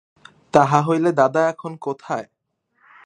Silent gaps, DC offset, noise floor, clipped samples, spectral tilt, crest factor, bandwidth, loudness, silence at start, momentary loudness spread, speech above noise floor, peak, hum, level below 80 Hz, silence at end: none; under 0.1%; -66 dBFS; under 0.1%; -6.5 dB/octave; 20 dB; 10 kHz; -19 LUFS; 0.55 s; 13 LU; 48 dB; 0 dBFS; none; -64 dBFS; 0.8 s